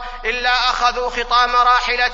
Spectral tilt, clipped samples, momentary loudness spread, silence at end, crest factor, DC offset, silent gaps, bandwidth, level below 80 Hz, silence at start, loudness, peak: -0.5 dB/octave; under 0.1%; 7 LU; 0 s; 14 dB; under 0.1%; none; 7.8 kHz; -34 dBFS; 0 s; -16 LUFS; -2 dBFS